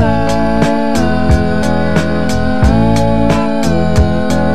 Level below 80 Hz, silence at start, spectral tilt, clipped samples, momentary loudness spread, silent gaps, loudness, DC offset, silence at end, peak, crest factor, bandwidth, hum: -20 dBFS; 0 s; -6.5 dB/octave; under 0.1%; 3 LU; none; -13 LUFS; 10%; 0 s; 0 dBFS; 12 dB; 14 kHz; none